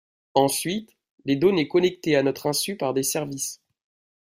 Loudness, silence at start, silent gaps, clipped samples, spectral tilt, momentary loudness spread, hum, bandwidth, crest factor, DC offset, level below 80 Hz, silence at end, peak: -24 LUFS; 0.35 s; 1.11-1.18 s; under 0.1%; -4 dB/octave; 10 LU; none; 16 kHz; 20 dB; under 0.1%; -62 dBFS; 0.7 s; -4 dBFS